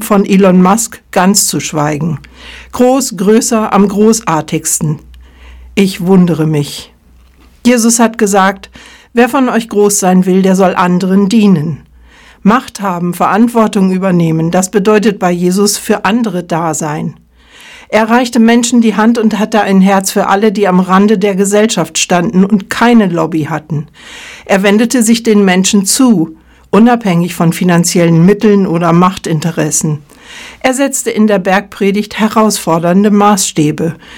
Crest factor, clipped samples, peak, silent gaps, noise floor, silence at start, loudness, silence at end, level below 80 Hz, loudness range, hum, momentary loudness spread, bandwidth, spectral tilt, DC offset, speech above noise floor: 10 dB; 1%; 0 dBFS; none; -42 dBFS; 0 s; -10 LUFS; 0 s; -44 dBFS; 3 LU; none; 9 LU; 17.5 kHz; -5 dB/octave; under 0.1%; 33 dB